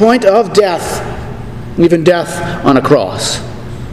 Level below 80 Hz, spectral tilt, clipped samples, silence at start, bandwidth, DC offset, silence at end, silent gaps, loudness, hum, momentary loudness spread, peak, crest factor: -34 dBFS; -5 dB/octave; 0.5%; 0 s; 14.5 kHz; 2%; 0 s; none; -11 LUFS; none; 16 LU; 0 dBFS; 12 dB